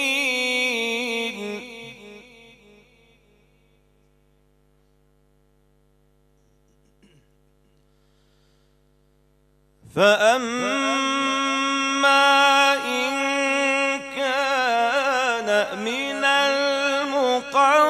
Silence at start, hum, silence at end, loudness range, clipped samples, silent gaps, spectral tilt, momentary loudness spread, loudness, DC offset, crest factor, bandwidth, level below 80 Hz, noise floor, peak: 0 s; 50 Hz at -60 dBFS; 0 s; 11 LU; under 0.1%; none; -2 dB/octave; 10 LU; -20 LUFS; under 0.1%; 20 dB; 15.5 kHz; -64 dBFS; -61 dBFS; -4 dBFS